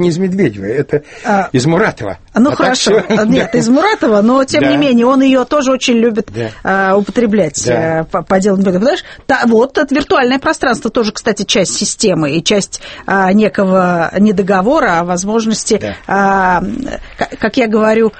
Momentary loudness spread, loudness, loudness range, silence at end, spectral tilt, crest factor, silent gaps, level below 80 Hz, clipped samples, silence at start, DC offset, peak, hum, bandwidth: 7 LU; -12 LUFS; 3 LU; 0.1 s; -4.5 dB/octave; 12 dB; none; -40 dBFS; under 0.1%; 0 s; under 0.1%; 0 dBFS; none; 8.8 kHz